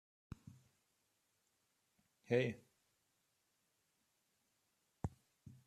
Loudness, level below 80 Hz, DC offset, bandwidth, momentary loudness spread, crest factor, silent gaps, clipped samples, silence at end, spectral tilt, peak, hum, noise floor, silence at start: -42 LUFS; -70 dBFS; under 0.1%; 13.5 kHz; 24 LU; 28 dB; none; under 0.1%; 0.15 s; -7 dB/octave; -22 dBFS; none; -83 dBFS; 2.3 s